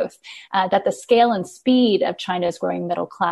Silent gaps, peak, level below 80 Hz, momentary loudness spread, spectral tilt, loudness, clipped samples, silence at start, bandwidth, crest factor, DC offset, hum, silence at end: none; -4 dBFS; -64 dBFS; 9 LU; -5.5 dB/octave; -20 LUFS; under 0.1%; 0 s; 12 kHz; 16 dB; under 0.1%; none; 0 s